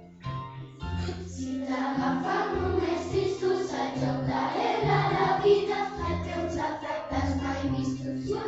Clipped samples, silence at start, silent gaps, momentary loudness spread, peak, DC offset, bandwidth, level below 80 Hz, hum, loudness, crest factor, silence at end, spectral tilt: under 0.1%; 0 s; none; 11 LU; -12 dBFS; under 0.1%; 8 kHz; -46 dBFS; none; -29 LUFS; 18 dB; 0 s; -6.5 dB/octave